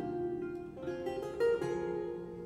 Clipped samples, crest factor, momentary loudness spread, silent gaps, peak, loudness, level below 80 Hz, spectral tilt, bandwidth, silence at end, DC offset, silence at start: under 0.1%; 14 dB; 9 LU; none; -22 dBFS; -37 LUFS; -62 dBFS; -7 dB/octave; 13 kHz; 0 s; under 0.1%; 0 s